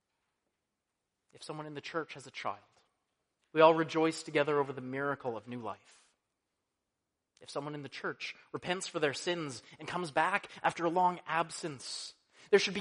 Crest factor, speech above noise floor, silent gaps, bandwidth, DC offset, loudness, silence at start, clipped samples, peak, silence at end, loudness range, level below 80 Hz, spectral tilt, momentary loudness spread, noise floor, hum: 26 dB; 53 dB; none; 10.5 kHz; under 0.1%; -34 LUFS; 1.4 s; under 0.1%; -10 dBFS; 0 s; 12 LU; -80 dBFS; -4 dB/octave; 14 LU; -87 dBFS; none